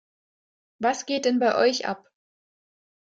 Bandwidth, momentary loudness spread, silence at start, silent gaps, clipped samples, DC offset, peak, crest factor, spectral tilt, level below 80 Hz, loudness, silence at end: 8.8 kHz; 10 LU; 0.8 s; none; under 0.1%; under 0.1%; -8 dBFS; 18 dB; -3 dB/octave; -74 dBFS; -24 LUFS; 1.2 s